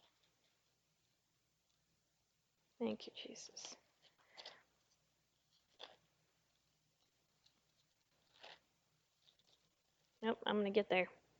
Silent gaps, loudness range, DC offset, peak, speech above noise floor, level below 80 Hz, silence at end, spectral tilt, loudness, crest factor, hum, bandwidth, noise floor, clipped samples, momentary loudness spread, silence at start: none; 23 LU; under 0.1%; -22 dBFS; 43 dB; -90 dBFS; 0.25 s; -4.5 dB/octave; -42 LUFS; 28 dB; none; 19 kHz; -84 dBFS; under 0.1%; 23 LU; 2.8 s